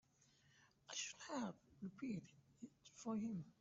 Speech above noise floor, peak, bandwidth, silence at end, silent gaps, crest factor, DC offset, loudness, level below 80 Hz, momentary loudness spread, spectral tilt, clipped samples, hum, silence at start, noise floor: 27 dB; -34 dBFS; 8 kHz; 0.1 s; none; 16 dB; under 0.1%; -49 LUFS; -84 dBFS; 15 LU; -4.5 dB/octave; under 0.1%; none; 0.55 s; -75 dBFS